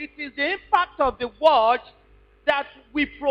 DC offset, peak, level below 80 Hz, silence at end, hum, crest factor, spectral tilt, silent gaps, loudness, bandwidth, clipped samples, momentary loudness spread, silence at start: under 0.1%; -6 dBFS; -50 dBFS; 0 s; none; 18 dB; -5 dB/octave; none; -23 LUFS; 7.8 kHz; under 0.1%; 9 LU; 0 s